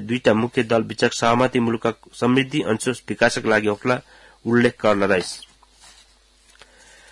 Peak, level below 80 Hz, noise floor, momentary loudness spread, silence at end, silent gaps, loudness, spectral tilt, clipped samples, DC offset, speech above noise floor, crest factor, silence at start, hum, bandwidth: -4 dBFS; -54 dBFS; -55 dBFS; 7 LU; 1.7 s; none; -20 LUFS; -5 dB/octave; under 0.1%; under 0.1%; 35 dB; 18 dB; 0 s; none; 12 kHz